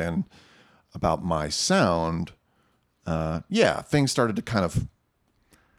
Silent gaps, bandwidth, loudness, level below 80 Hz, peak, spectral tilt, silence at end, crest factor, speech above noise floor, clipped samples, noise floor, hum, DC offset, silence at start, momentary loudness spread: none; 15 kHz; -25 LUFS; -46 dBFS; -6 dBFS; -5 dB/octave; 0.9 s; 20 dB; 44 dB; under 0.1%; -69 dBFS; none; under 0.1%; 0 s; 15 LU